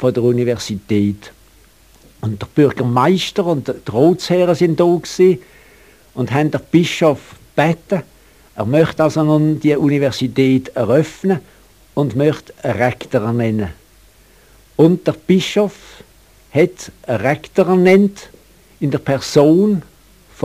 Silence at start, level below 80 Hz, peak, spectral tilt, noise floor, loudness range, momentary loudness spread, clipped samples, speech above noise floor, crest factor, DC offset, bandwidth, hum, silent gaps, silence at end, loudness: 0 s; -50 dBFS; 0 dBFS; -6.5 dB/octave; -48 dBFS; 3 LU; 10 LU; under 0.1%; 33 dB; 16 dB; 0.1%; 15.5 kHz; none; none; 0.65 s; -16 LUFS